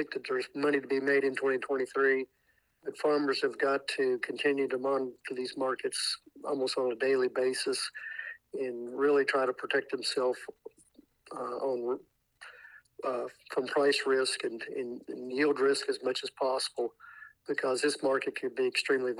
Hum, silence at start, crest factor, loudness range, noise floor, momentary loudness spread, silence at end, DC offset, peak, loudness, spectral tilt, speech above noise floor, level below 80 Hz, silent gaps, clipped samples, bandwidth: none; 0 s; 18 dB; 4 LU; -63 dBFS; 12 LU; 0 s; under 0.1%; -14 dBFS; -31 LUFS; -2.5 dB/octave; 32 dB; -82 dBFS; none; under 0.1%; 12.5 kHz